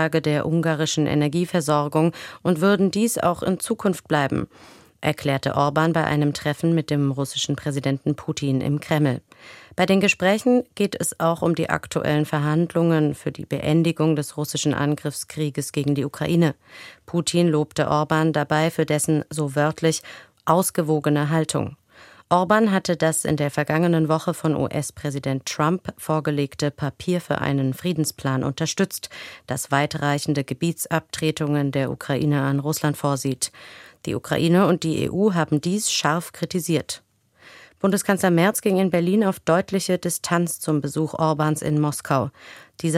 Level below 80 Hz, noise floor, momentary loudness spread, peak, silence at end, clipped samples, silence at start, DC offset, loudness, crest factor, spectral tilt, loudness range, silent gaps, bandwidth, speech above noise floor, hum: -56 dBFS; -51 dBFS; 8 LU; -2 dBFS; 0 s; under 0.1%; 0 s; under 0.1%; -22 LUFS; 20 dB; -5.5 dB/octave; 3 LU; none; 16 kHz; 29 dB; none